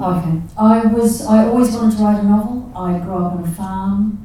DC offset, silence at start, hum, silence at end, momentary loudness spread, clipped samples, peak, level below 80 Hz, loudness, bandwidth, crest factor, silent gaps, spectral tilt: 0.1%; 0 s; none; 0 s; 10 LU; under 0.1%; 0 dBFS; -38 dBFS; -16 LUFS; 14 kHz; 14 dB; none; -7.5 dB/octave